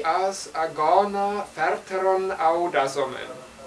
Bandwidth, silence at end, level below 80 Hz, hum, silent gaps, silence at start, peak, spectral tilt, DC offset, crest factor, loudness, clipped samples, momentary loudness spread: 11 kHz; 0 s; -62 dBFS; none; none; 0 s; -4 dBFS; -4 dB/octave; under 0.1%; 20 dB; -24 LUFS; under 0.1%; 8 LU